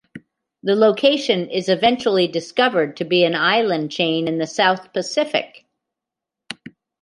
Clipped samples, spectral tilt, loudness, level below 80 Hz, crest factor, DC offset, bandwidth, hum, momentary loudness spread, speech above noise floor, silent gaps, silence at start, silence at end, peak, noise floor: under 0.1%; -4.5 dB/octave; -18 LUFS; -66 dBFS; 18 dB; under 0.1%; 11.5 kHz; none; 10 LU; 67 dB; none; 0.15 s; 0.35 s; -2 dBFS; -85 dBFS